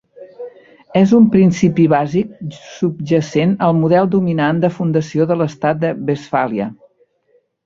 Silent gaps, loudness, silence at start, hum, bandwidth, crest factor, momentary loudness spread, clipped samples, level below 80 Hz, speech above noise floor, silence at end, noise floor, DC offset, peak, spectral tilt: none; -15 LUFS; 0.2 s; none; 7.6 kHz; 14 dB; 15 LU; under 0.1%; -52 dBFS; 45 dB; 0.9 s; -59 dBFS; under 0.1%; -2 dBFS; -8 dB/octave